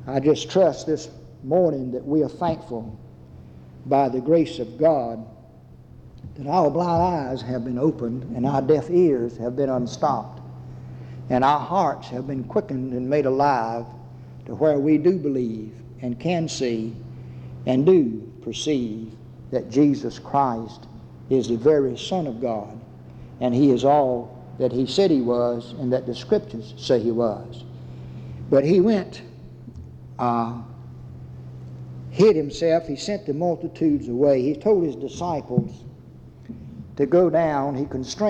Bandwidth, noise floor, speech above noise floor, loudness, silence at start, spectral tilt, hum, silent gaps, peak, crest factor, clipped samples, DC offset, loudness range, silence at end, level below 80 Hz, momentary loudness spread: 9 kHz; -46 dBFS; 25 dB; -22 LUFS; 0 s; -7 dB/octave; none; none; -6 dBFS; 16 dB; under 0.1%; under 0.1%; 3 LU; 0 s; -52 dBFS; 21 LU